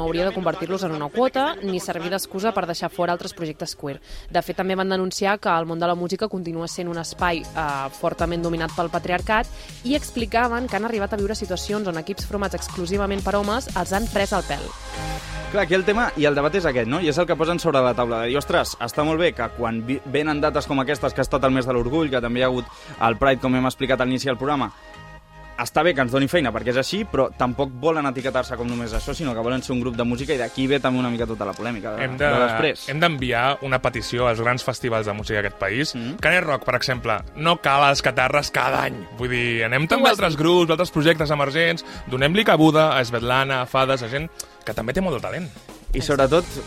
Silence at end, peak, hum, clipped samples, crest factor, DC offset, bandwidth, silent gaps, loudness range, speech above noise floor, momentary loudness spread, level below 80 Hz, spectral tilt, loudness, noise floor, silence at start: 0 s; -2 dBFS; none; under 0.1%; 20 dB; under 0.1%; 16 kHz; none; 6 LU; 20 dB; 10 LU; -40 dBFS; -5 dB/octave; -22 LUFS; -42 dBFS; 0 s